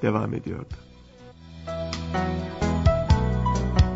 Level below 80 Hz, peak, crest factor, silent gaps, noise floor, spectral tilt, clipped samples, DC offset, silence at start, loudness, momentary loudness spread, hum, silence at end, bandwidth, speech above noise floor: -30 dBFS; -6 dBFS; 18 dB; none; -47 dBFS; -7 dB/octave; under 0.1%; under 0.1%; 0 s; -25 LUFS; 18 LU; none; 0 s; 8 kHz; 20 dB